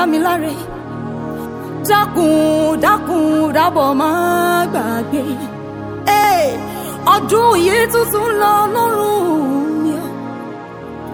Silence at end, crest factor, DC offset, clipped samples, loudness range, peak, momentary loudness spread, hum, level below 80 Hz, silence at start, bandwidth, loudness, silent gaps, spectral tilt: 0 s; 16 dB; under 0.1%; under 0.1%; 2 LU; 0 dBFS; 14 LU; none; -46 dBFS; 0 s; over 20 kHz; -15 LUFS; none; -4.5 dB/octave